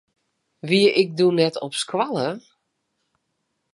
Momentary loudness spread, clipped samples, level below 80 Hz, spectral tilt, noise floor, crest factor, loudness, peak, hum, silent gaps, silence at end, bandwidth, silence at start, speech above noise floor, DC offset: 11 LU; under 0.1%; -74 dBFS; -5 dB/octave; -75 dBFS; 20 dB; -21 LUFS; -4 dBFS; none; none; 1.35 s; 11.5 kHz; 0.65 s; 55 dB; under 0.1%